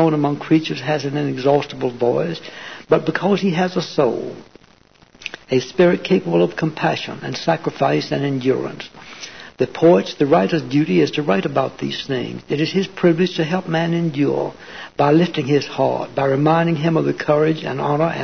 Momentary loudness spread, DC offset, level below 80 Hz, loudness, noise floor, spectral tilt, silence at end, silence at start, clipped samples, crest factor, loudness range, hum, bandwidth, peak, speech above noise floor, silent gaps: 12 LU; 0.3%; -58 dBFS; -19 LUFS; -51 dBFS; -7 dB/octave; 0 s; 0 s; under 0.1%; 16 dB; 3 LU; none; 6.6 kHz; -4 dBFS; 33 dB; none